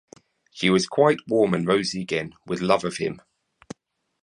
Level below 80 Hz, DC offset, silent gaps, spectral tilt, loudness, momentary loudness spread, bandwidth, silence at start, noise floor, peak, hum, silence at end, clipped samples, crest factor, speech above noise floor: -60 dBFS; under 0.1%; none; -5 dB/octave; -23 LUFS; 24 LU; 11 kHz; 0.55 s; -69 dBFS; -4 dBFS; none; 1.05 s; under 0.1%; 20 dB; 47 dB